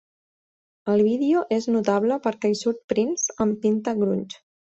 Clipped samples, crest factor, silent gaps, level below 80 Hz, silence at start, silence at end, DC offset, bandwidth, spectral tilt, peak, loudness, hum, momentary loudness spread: under 0.1%; 16 dB; 2.84-2.89 s; -64 dBFS; 0.85 s; 0.35 s; under 0.1%; 8 kHz; -5 dB/octave; -6 dBFS; -23 LUFS; none; 6 LU